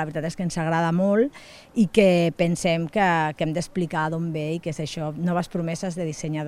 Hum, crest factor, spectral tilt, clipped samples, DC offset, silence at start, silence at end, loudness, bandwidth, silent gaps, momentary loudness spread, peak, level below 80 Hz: none; 20 dB; -6 dB/octave; under 0.1%; under 0.1%; 0 s; 0 s; -24 LUFS; 12.5 kHz; none; 10 LU; -4 dBFS; -52 dBFS